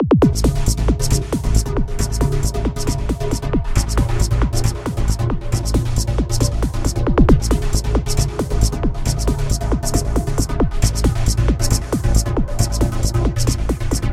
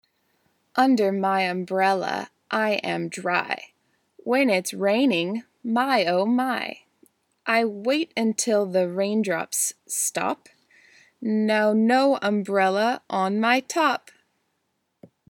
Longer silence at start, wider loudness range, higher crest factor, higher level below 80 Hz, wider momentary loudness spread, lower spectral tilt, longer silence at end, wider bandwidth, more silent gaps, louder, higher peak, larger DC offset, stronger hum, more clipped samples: second, 0 s vs 0.75 s; about the same, 2 LU vs 3 LU; about the same, 16 dB vs 18 dB; first, -20 dBFS vs -80 dBFS; second, 5 LU vs 9 LU; first, -5.5 dB/octave vs -4 dB/octave; second, 0 s vs 1.35 s; second, 15.5 kHz vs 18.5 kHz; neither; first, -19 LUFS vs -23 LUFS; first, 0 dBFS vs -6 dBFS; neither; neither; neither